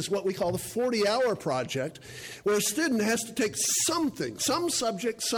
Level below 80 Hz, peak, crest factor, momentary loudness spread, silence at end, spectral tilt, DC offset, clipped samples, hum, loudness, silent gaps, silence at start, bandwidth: -62 dBFS; -16 dBFS; 12 dB; 8 LU; 0 s; -3 dB/octave; under 0.1%; under 0.1%; none; -28 LUFS; none; 0 s; 19.5 kHz